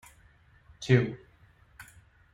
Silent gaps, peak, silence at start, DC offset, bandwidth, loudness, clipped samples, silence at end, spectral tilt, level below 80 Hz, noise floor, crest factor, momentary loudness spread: none; -8 dBFS; 0.8 s; under 0.1%; 11.5 kHz; -27 LUFS; under 0.1%; 0.5 s; -7 dB/octave; -60 dBFS; -60 dBFS; 24 dB; 26 LU